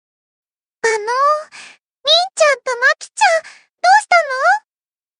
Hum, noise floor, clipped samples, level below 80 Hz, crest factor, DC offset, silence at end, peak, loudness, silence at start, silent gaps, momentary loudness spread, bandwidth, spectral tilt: none; under -90 dBFS; under 0.1%; -82 dBFS; 16 dB; under 0.1%; 0.6 s; 0 dBFS; -15 LUFS; 0.85 s; none; 9 LU; 11 kHz; 2.5 dB/octave